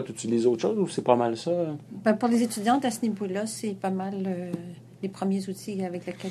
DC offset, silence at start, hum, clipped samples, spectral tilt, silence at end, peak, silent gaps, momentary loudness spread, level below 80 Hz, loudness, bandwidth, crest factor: under 0.1%; 0 s; none; under 0.1%; -5.5 dB/octave; 0 s; -4 dBFS; none; 10 LU; -74 dBFS; -27 LUFS; 13.5 kHz; 22 dB